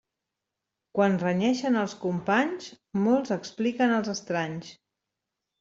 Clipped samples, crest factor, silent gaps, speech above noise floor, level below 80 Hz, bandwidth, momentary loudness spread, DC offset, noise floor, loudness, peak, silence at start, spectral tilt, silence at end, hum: under 0.1%; 18 dB; none; 60 dB; -70 dBFS; 7.8 kHz; 10 LU; under 0.1%; -86 dBFS; -27 LUFS; -10 dBFS; 0.95 s; -6 dB/octave; 0.85 s; none